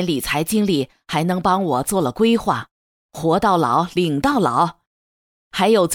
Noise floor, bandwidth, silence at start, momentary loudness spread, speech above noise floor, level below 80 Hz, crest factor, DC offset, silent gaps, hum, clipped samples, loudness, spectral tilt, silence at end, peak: under -90 dBFS; over 20 kHz; 0 s; 7 LU; over 72 dB; -48 dBFS; 14 dB; under 0.1%; 2.71-3.09 s, 4.87-5.51 s; none; under 0.1%; -19 LUFS; -5 dB/octave; 0 s; -4 dBFS